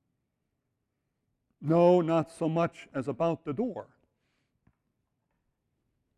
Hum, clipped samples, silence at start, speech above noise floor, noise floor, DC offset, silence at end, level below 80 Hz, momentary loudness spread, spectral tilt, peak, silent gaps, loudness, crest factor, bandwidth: none; under 0.1%; 1.6 s; 54 dB; -82 dBFS; under 0.1%; 2.35 s; -70 dBFS; 14 LU; -8.5 dB/octave; -10 dBFS; none; -28 LUFS; 22 dB; 10.5 kHz